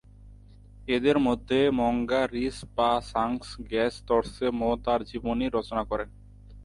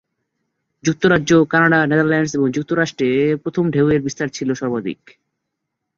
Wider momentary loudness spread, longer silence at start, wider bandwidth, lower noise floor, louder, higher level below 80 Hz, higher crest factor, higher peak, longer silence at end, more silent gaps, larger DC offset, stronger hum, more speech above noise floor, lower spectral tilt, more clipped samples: about the same, 8 LU vs 10 LU; second, 0.2 s vs 0.85 s; first, 11.5 kHz vs 7.6 kHz; second, -50 dBFS vs -78 dBFS; second, -27 LUFS vs -17 LUFS; first, -46 dBFS vs -52 dBFS; about the same, 18 dB vs 16 dB; second, -10 dBFS vs -2 dBFS; second, 0 s vs 1.05 s; neither; neither; neither; second, 23 dB vs 61 dB; about the same, -6 dB/octave vs -6 dB/octave; neither